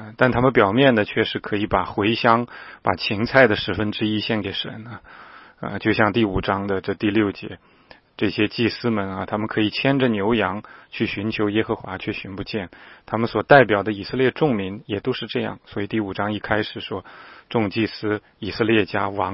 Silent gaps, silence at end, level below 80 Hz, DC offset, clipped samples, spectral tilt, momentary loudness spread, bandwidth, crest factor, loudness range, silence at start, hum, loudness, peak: none; 0 s; -48 dBFS; under 0.1%; under 0.1%; -9 dB/octave; 13 LU; 5.8 kHz; 22 dB; 5 LU; 0 s; none; -21 LUFS; 0 dBFS